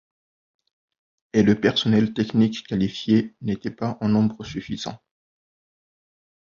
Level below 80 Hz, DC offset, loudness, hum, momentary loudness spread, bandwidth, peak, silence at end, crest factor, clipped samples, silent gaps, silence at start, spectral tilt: -54 dBFS; under 0.1%; -22 LUFS; none; 12 LU; 7.2 kHz; -4 dBFS; 1.55 s; 20 dB; under 0.1%; none; 1.35 s; -6.5 dB/octave